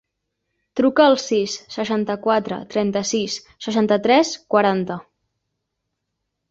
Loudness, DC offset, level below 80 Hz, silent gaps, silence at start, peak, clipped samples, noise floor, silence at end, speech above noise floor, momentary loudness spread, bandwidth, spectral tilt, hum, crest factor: -20 LUFS; under 0.1%; -62 dBFS; none; 0.75 s; -2 dBFS; under 0.1%; -78 dBFS; 1.5 s; 59 dB; 11 LU; 8 kHz; -4.5 dB/octave; none; 20 dB